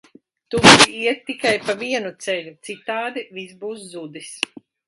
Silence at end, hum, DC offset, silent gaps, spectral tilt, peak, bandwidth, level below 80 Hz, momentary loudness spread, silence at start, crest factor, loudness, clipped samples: 0.5 s; none; under 0.1%; none; -2.5 dB/octave; 0 dBFS; 16 kHz; -52 dBFS; 24 LU; 0.5 s; 20 dB; -17 LUFS; under 0.1%